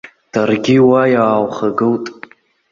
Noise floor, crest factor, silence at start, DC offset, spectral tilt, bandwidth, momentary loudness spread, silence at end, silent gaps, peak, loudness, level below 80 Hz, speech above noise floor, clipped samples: -40 dBFS; 14 dB; 0.05 s; under 0.1%; -7 dB/octave; 7.4 kHz; 11 LU; 0.6 s; none; 0 dBFS; -14 LUFS; -54 dBFS; 27 dB; under 0.1%